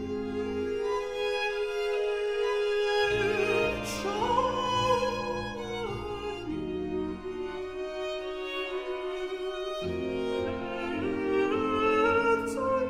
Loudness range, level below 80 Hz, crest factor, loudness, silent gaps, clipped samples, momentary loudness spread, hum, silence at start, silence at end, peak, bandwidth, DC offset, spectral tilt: 7 LU; -52 dBFS; 16 dB; -30 LUFS; none; under 0.1%; 9 LU; none; 0 s; 0 s; -14 dBFS; 15.5 kHz; under 0.1%; -5 dB/octave